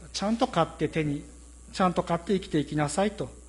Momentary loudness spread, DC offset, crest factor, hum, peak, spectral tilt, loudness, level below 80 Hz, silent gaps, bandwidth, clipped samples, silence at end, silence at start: 7 LU; under 0.1%; 20 dB; none; -10 dBFS; -5.5 dB/octave; -28 LUFS; -48 dBFS; none; 11.5 kHz; under 0.1%; 0 s; 0 s